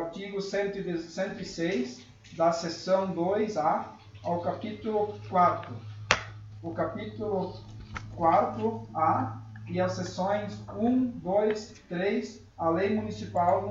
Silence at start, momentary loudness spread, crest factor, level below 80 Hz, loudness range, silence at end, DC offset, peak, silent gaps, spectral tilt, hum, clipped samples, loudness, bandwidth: 0 s; 13 LU; 30 dB; -58 dBFS; 1 LU; 0 s; under 0.1%; 0 dBFS; none; -6 dB/octave; none; under 0.1%; -30 LUFS; 7.8 kHz